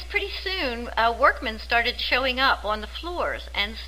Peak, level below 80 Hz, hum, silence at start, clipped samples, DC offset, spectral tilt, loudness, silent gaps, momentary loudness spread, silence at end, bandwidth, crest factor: -6 dBFS; -38 dBFS; none; 0 s; under 0.1%; 0.3%; -4 dB/octave; -24 LUFS; none; 9 LU; 0 s; 16 kHz; 20 dB